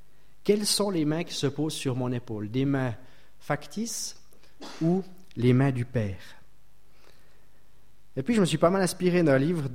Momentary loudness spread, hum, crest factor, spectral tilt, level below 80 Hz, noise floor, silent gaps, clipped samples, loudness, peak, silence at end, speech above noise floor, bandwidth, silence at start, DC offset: 13 LU; none; 20 dB; -5.5 dB/octave; -56 dBFS; -63 dBFS; none; under 0.1%; -27 LUFS; -8 dBFS; 0 s; 37 dB; 16.5 kHz; 0.45 s; 0.8%